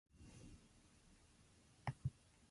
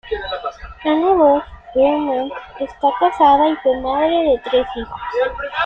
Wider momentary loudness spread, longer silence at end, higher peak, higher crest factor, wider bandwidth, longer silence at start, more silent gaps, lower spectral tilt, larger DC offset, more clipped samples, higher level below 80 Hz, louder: first, 22 LU vs 14 LU; about the same, 0 s vs 0 s; second, -30 dBFS vs -2 dBFS; first, 26 dB vs 14 dB; first, 11.5 kHz vs 6.6 kHz; about the same, 0.15 s vs 0.05 s; neither; about the same, -6 dB/octave vs -6.5 dB/octave; neither; neither; second, -66 dBFS vs -42 dBFS; second, -53 LUFS vs -17 LUFS